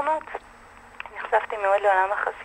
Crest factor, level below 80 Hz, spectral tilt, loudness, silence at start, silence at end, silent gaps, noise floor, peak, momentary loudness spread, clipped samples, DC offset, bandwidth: 18 dB; -60 dBFS; -3.5 dB/octave; -23 LUFS; 0 s; 0 s; none; -48 dBFS; -8 dBFS; 18 LU; under 0.1%; under 0.1%; 10 kHz